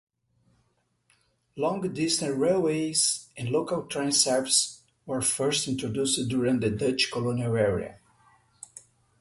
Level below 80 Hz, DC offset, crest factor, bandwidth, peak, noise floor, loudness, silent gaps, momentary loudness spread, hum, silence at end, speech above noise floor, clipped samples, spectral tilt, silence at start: -58 dBFS; under 0.1%; 20 dB; 12 kHz; -8 dBFS; -72 dBFS; -26 LUFS; none; 11 LU; none; 0.4 s; 45 dB; under 0.1%; -3.5 dB/octave; 1.55 s